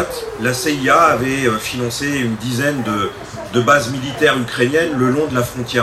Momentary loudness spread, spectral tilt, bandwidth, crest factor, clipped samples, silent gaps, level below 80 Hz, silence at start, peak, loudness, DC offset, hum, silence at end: 8 LU; -4.5 dB/octave; 15 kHz; 16 dB; under 0.1%; none; -46 dBFS; 0 s; 0 dBFS; -16 LUFS; under 0.1%; none; 0 s